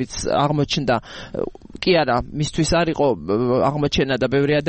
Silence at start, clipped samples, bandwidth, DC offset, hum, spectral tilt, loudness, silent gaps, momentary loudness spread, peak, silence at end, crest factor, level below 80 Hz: 0 s; under 0.1%; 8.8 kHz; under 0.1%; none; -5.5 dB/octave; -20 LUFS; none; 9 LU; -4 dBFS; 0 s; 16 dB; -40 dBFS